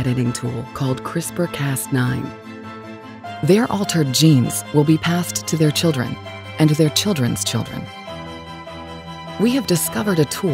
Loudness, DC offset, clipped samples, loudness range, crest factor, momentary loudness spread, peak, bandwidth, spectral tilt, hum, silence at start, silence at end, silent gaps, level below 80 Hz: -19 LUFS; under 0.1%; under 0.1%; 5 LU; 18 dB; 17 LU; -2 dBFS; 16.5 kHz; -5 dB/octave; none; 0 s; 0 s; none; -50 dBFS